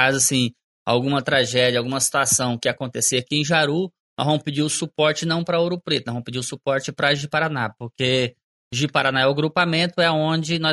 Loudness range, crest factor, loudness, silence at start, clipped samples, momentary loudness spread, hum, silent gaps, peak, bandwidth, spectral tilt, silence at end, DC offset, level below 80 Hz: 3 LU; 18 dB; -21 LUFS; 0 s; under 0.1%; 8 LU; none; 0.64-0.86 s, 4.00-4.16 s, 8.44-8.71 s; -4 dBFS; 11.5 kHz; -3.5 dB/octave; 0 s; under 0.1%; -58 dBFS